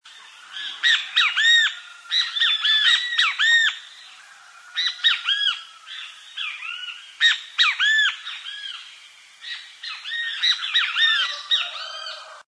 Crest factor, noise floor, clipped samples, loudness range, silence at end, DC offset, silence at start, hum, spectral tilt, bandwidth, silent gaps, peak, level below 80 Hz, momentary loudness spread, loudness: 18 dB; -47 dBFS; under 0.1%; 6 LU; 0.05 s; under 0.1%; 0.05 s; none; 6.5 dB/octave; 11 kHz; none; -6 dBFS; under -90 dBFS; 18 LU; -19 LUFS